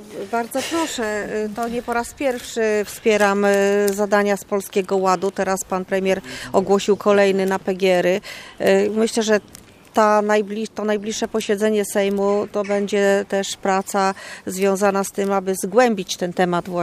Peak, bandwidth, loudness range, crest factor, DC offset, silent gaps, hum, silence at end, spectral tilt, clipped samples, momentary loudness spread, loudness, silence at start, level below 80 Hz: -2 dBFS; 15.5 kHz; 2 LU; 18 dB; under 0.1%; none; none; 0 s; -4.5 dB/octave; under 0.1%; 7 LU; -20 LUFS; 0 s; -56 dBFS